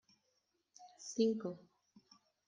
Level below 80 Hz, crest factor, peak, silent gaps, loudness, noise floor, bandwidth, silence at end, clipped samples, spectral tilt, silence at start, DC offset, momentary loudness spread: -88 dBFS; 22 dB; -22 dBFS; none; -38 LUFS; -82 dBFS; 9.6 kHz; 0.9 s; under 0.1%; -5 dB/octave; 0.8 s; under 0.1%; 21 LU